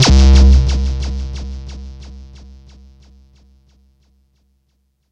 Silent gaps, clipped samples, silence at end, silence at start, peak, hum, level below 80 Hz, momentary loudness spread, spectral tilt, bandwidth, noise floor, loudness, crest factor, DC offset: none; under 0.1%; 2.9 s; 0 s; 0 dBFS; none; -16 dBFS; 27 LU; -5.5 dB/octave; 8.4 kHz; -64 dBFS; -13 LUFS; 16 dB; under 0.1%